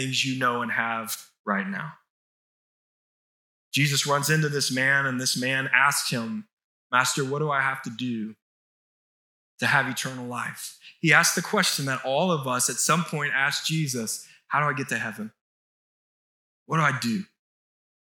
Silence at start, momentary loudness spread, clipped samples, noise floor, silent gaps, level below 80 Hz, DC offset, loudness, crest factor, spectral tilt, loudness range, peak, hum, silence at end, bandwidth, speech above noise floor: 0 s; 13 LU; under 0.1%; under -90 dBFS; 1.39-1.44 s, 2.10-3.71 s, 6.53-6.57 s, 6.64-6.90 s, 8.42-9.58 s, 15.41-16.66 s; -82 dBFS; under 0.1%; -24 LUFS; 24 dB; -3 dB/octave; 7 LU; -4 dBFS; none; 0.85 s; 19 kHz; over 65 dB